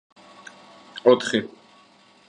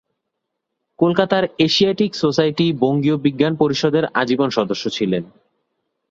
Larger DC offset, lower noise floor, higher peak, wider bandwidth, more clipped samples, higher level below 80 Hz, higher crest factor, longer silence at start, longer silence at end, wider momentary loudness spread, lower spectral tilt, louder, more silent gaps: neither; second, -55 dBFS vs -78 dBFS; about the same, -2 dBFS vs 0 dBFS; first, 10 kHz vs 7.6 kHz; neither; second, -72 dBFS vs -58 dBFS; about the same, 22 dB vs 18 dB; about the same, 0.95 s vs 1 s; about the same, 0.8 s vs 0.85 s; first, 26 LU vs 5 LU; second, -4.5 dB/octave vs -6 dB/octave; second, -21 LUFS vs -18 LUFS; neither